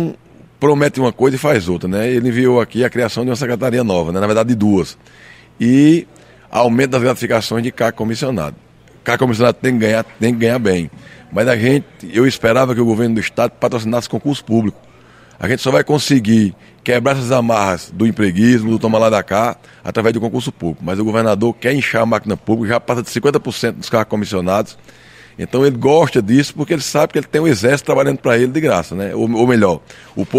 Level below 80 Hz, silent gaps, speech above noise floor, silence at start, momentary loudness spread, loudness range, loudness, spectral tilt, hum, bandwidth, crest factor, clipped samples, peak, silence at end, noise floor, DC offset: -50 dBFS; none; 29 dB; 0 s; 8 LU; 2 LU; -15 LUFS; -6 dB/octave; none; 15.5 kHz; 14 dB; under 0.1%; 0 dBFS; 0 s; -44 dBFS; under 0.1%